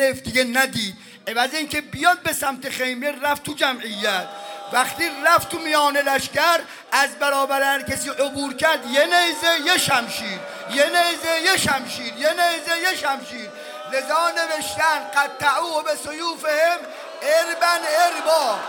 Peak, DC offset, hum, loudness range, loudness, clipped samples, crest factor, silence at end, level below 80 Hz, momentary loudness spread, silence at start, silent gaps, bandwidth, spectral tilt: -2 dBFS; under 0.1%; none; 3 LU; -20 LUFS; under 0.1%; 18 dB; 0 s; -58 dBFS; 9 LU; 0 s; none; 19 kHz; -1.5 dB/octave